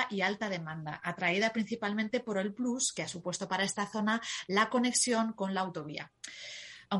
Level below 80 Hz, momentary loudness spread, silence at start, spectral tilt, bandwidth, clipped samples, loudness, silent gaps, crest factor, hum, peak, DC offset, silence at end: -74 dBFS; 14 LU; 0 s; -3 dB/octave; 11.5 kHz; under 0.1%; -32 LUFS; none; 20 dB; none; -14 dBFS; under 0.1%; 0 s